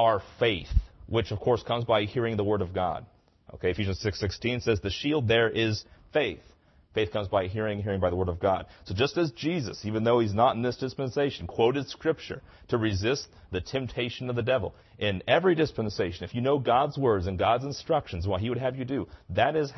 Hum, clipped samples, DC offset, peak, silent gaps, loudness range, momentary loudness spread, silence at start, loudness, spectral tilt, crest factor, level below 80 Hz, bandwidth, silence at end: none; under 0.1%; under 0.1%; -10 dBFS; none; 3 LU; 8 LU; 0 s; -28 LUFS; -6 dB/octave; 18 dB; -44 dBFS; 6.2 kHz; 0 s